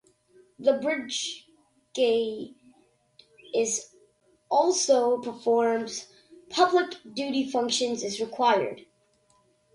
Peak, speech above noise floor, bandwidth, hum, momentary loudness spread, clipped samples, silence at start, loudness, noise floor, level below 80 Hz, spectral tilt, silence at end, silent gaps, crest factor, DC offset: -8 dBFS; 41 dB; 11.5 kHz; none; 12 LU; under 0.1%; 0.6 s; -26 LUFS; -66 dBFS; -74 dBFS; -2 dB/octave; 0.95 s; none; 20 dB; under 0.1%